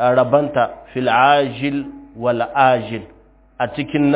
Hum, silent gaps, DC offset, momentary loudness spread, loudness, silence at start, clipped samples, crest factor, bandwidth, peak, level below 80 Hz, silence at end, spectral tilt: none; none; under 0.1%; 12 LU; -17 LUFS; 0 s; under 0.1%; 18 dB; 4 kHz; 0 dBFS; -50 dBFS; 0 s; -10 dB/octave